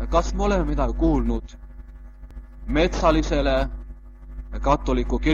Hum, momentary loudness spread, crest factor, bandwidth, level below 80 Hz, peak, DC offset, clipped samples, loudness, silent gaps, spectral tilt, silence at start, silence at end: none; 23 LU; 18 dB; 7.4 kHz; -28 dBFS; -4 dBFS; under 0.1%; under 0.1%; -23 LUFS; none; -6.5 dB/octave; 0 s; 0 s